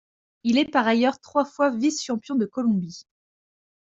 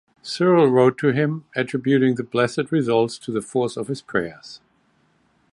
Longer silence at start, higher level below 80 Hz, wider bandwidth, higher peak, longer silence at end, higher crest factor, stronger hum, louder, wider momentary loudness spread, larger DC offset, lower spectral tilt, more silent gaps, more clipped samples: first, 0.45 s vs 0.25 s; second, -68 dBFS vs -62 dBFS; second, 7.8 kHz vs 11.5 kHz; about the same, -6 dBFS vs -4 dBFS; second, 0.8 s vs 0.95 s; about the same, 18 dB vs 18 dB; neither; about the same, -23 LUFS vs -21 LUFS; second, 8 LU vs 12 LU; neither; second, -4.5 dB/octave vs -6.5 dB/octave; neither; neither